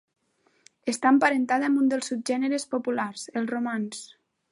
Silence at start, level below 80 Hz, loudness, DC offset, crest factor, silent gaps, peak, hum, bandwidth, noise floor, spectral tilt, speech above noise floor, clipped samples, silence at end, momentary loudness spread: 0.85 s; -80 dBFS; -26 LUFS; under 0.1%; 20 dB; none; -6 dBFS; none; 11.5 kHz; -68 dBFS; -4 dB/octave; 43 dB; under 0.1%; 0.45 s; 11 LU